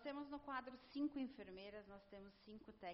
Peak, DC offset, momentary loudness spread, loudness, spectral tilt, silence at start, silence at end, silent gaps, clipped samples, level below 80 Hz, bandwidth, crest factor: -34 dBFS; under 0.1%; 15 LU; -52 LUFS; -3.5 dB/octave; 0 s; 0 s; none; under 0.1%; -76 dBFS; 5.6 kHz; 18 dB